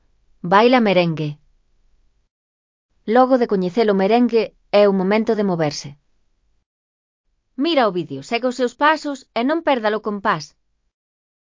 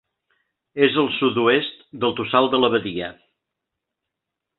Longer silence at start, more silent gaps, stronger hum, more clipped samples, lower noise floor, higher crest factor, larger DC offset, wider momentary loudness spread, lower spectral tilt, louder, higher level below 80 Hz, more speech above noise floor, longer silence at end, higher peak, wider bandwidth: second, 0.45 s vs 0.75 s; first, 2.31-2.89 s, 6.66-7.24 s vs none; neither; neither; second, -63 dBFS vs -83 dBFS; about the same, 20 dB vs 20 dB; neither; about the same, 12 LU vs 13 LU; second, -6 dB/octave vs -9.5 dB/octave; about the same, -18 LUFS vs -20 LUFS; about the same, -62 dBFS vs -60 dBFS; second, 45 dB vs 63 dB; second, 1.05 s vs 1.45 s; about the same, 0 dBFS vs -2 dBFS; first, 7.6 kHz vs 4.3 kHz